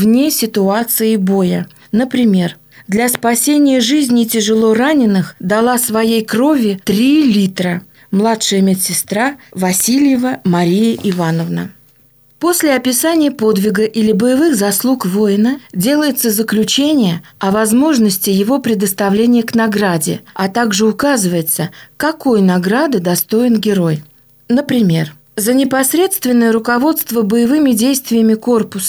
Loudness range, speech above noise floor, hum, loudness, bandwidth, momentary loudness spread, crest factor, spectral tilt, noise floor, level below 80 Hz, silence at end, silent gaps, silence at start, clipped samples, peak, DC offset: 2 LU; 36 dB; none; -13 LUFS; over 20 kHz; 6 LU; 12 dB; -4.5 dB/octave; -48 dBFS; -54 dBFS; 0 s; none; 0 s; under 0.1%; 0 dBFS; under 0.1%